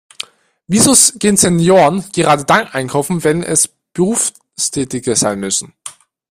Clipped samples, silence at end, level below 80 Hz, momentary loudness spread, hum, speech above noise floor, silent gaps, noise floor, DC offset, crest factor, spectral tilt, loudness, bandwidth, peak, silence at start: under 0.1%; 0.4 s; -48 dBFS; 13 LU; none; 23 dB; none; -36 dBFS; under 0.1%; 14 dB; -3.5 dB/octave; -13 LUFS; 16 kHz; 0 dBFS; 0.2 s